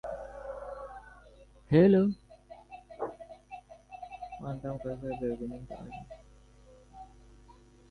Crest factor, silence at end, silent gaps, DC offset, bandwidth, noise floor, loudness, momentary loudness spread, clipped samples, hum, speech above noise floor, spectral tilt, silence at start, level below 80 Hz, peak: 22 dB; 0.4 s; none; under 0.1%; 9.6 kHz; -57 dBFS; -31 LUFS; 28 LU; under 0.1%; 50 Hz at -55 dBFS; 29 dB; -9.5 dB/octave; 0.05 s; -56 dBFS; -12 dBFS